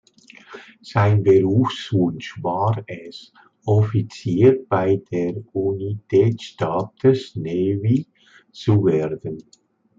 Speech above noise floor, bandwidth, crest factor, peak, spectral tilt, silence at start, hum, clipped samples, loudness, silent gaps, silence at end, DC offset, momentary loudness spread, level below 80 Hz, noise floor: 28 dB; 7.6 kHz; 18 dB; -4 dBFS; -8.5 dB/octave; 0.5 s; none; under 0.1%; -20 LUFS; none; 0.55 s; under 0.1%; 19 LU; -60 dBFS; -47 dBFS